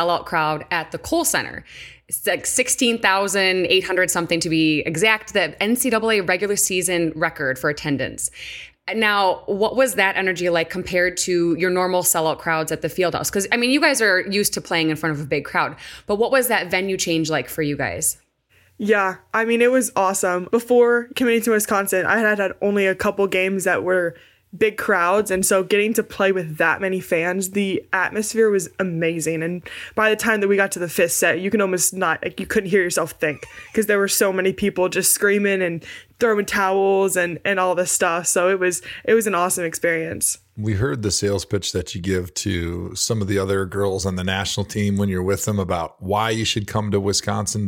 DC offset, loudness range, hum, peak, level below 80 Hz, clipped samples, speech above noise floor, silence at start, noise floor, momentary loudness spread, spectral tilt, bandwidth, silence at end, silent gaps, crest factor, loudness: under 0.1%; 4 LU; none; -2 dBFS; -50 dBFS; under 0.1%; 38 dB; 0 s; -59 dBFS; 7 LU; -3.5 dB/octave; 17 kHz; 0 s; none; 18 dB; -20 LUFS